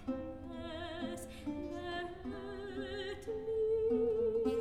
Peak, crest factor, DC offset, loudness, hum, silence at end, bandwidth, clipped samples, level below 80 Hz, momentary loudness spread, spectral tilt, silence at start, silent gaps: -24 dBFS; 14 dB; 0.1%; -39 LUFS; none; 0 s; 13.5 kHz; under 0.1%; -58 dBFS; 12 LU; -6 dB/octave; 0 s; none